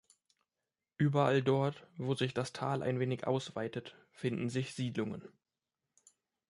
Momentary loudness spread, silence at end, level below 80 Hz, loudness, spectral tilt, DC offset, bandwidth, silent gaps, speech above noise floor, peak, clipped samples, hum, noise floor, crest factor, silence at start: 12 LU; 1.2 s; -74 dBFS; -35 LUFS; -6.5 dB/octave; under 0.1%; 11.5 kHz; none; over 56 dB; -16 dBFS; under 0.1%; none; under -90 dBFS; 20 dB; 1 s